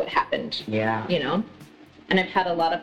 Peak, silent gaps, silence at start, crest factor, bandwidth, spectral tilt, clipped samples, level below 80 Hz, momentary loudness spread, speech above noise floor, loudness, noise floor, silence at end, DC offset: -8 dBFS; none; 0 s; 18 dB; 12 kHz; -6.5 dB/octave; under 0.1%; -60 dBFS; 6 LU; 24 dB; -25 LUFS; -48 dBFS; 0 s; under 0.1%